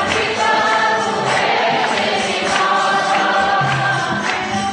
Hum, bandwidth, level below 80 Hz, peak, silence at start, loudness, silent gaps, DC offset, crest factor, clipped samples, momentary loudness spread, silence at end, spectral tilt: none; 10 kHz; -52 dBFS; -4 dBFS; 0 s; -16 LUFS; none; under 0.1%; 12 dB; under 0.1%; 3 LU; 0 s; -3 dB/octave